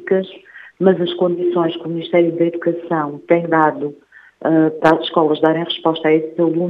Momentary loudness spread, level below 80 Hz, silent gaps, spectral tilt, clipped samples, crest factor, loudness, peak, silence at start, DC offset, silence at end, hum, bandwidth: 7 LU; -64 dBFS; none; -8 dB/octave; under 0.1%; 16 dB; -17 LUFS; 0 dBFS; 0 s; under 0.1%; 0 s; none; 5.2 kHz